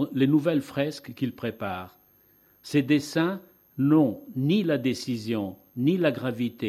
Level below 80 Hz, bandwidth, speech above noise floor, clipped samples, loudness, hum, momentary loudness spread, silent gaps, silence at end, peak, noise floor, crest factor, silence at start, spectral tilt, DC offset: -68 dBFS; 13.5 kHz; 35 dB; under 0.1%; -26 LUFS; none; 12 LU; none; 0 s; -10 dBFS; -61 dBFS; 16 dB; 0 s; -7 dB/octave; under 0.1%